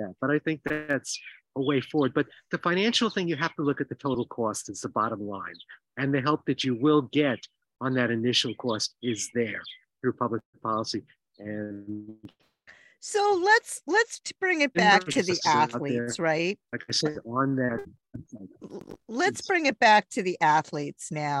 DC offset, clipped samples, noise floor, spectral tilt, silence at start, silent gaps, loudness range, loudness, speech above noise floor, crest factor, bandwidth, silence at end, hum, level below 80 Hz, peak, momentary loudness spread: under 0.1%; under 0.1%; -56 dBFS; -4 dB/octave; 0 s; 10.45-10.53 s; 7 LU; -26 LUFS; 29 dB; 22 dB; 12.5 kHz; 0 s; none; -68 dBFS; -4 dBFS; 16 LU